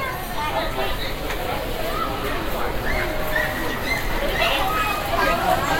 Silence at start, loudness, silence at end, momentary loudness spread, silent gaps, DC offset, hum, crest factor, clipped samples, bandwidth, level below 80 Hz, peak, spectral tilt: 0 s; -23 LUFS; 0 s; 6 LU; none; under 0.1%; none; 16 dB; under 0.1%; 16.5 kHz; -30 dBFS; -6 dBFS; -4 dB/octave